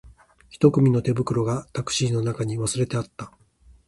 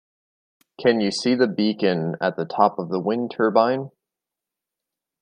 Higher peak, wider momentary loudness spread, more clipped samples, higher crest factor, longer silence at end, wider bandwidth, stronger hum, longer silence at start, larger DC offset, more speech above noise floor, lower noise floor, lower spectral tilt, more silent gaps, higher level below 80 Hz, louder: about the same, -4 dBFS vs -2 dBFS; first, 12 LU vs 6 LU; neither; about the same, 20 dB vs 22 dB; second, 0.6 s vs 1.35 s; first, 11.5 kHz vs 10 kHz; neither; second, 0.05 s vs 0.8 s; neither; second, 32 dB vs 66 dB; second, -55 dBFS vs -87 dBFS; about the same, -6 dB/octave vs -6 dB/octave; neither; first, -52 dBFS vs -70 dBFS; about the same, -23 LUFS vs -22 LUFS